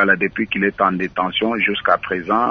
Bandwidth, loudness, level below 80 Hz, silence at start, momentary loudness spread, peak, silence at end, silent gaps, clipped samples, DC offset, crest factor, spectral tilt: 6.4 kHz; -18 LUFS; -52 dBFS; 0 s; 4 LU; 0 dBFS; 0 s; none; under 0.1%; under 0.1%; 18 dB; -7 dB/octave